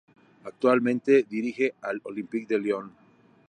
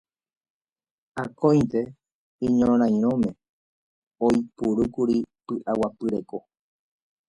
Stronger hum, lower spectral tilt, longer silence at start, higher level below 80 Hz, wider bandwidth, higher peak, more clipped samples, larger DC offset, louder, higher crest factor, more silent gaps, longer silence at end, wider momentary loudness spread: neither; second, -6.5 dB/octave vs -8 dB/octave; second, 0.45 s vs 1.15 s; second, -80 dBFS vs -56 dBFS; second, 9.4 kHz vs 10.5 kHz; about the same, -8 dBFS vs -6 dBFS; neither; neither; about the same, -26 LUFS vs -24 LUFS; about the same, 20 dB vs 18 dB; second, none vs 2.12-2.39 s, 3.49-4.11 s; second, 0.6 s vs 0.9 s; about the same, 15 LU vs 14 LU